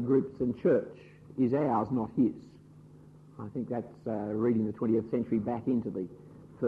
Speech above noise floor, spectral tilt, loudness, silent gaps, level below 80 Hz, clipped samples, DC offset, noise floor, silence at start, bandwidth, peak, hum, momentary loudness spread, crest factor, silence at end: 24 dB; -10.5 dB/octave; -31 LUFS; none; -64 dBFS; under 0.1%; under 0.1%; -54 dBFS; 0 s; 4.9 kHz; -16 dBFS; none; 14 LU; 16 dB; 0 s